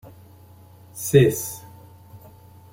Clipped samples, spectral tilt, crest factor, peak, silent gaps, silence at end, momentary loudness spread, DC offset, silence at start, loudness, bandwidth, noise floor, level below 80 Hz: under 0.1%; -6 dB/octave; 22 dB; -2 dBFS; none; 0.55 s; 22 LU; under 0.1%; 0.05 s; -20 LUFS; 16.5 kHz; -48 dBFS; -54 dBFS